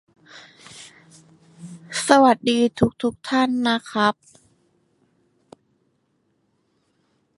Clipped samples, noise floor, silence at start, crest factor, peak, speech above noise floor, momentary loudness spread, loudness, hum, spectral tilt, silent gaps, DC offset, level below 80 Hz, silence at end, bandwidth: under 0.1%; -68 dBFS; 0.35 s; 24 dB; 0 dBFS; 49 dB; 27 LU; -20 LUFS; none; -4.5 dB/octave; none; under 0.1%; -58 dBFS; 3.25 s; 11.5 kHz